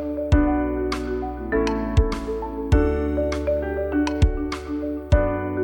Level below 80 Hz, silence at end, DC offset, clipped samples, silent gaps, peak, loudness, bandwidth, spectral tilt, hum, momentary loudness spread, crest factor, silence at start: -26 dBFS; 0 s; under 0.1%; under 0.1%; none; -6 dBFS; -23 LUFS; 17 kHz; -7.5 dB/octave; none; 8 LU; 16 dB; 0 s